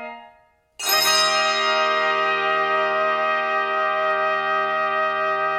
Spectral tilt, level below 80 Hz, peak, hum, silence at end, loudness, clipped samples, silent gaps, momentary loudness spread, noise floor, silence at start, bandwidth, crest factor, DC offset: -0.5 dB/octave; -66 dBFS; -4 dBFS; none; 0 s; -20 LUFS; under 0.1%; none; 5 LU; -56 dBFS; 0 s; 16 kHz; 16 dB; under 0.1%